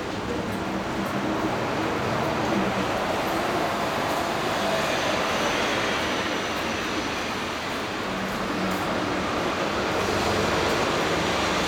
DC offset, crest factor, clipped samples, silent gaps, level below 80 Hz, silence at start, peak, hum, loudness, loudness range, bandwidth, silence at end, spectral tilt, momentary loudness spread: under 0.1%; 14 dB; under 0.1%; none; -46 dBFS; 0 s; -12 dBFS; none; -25 LUFS; 2 LU; 19 kHz; 0 s; -4 dB/octave; 5 LU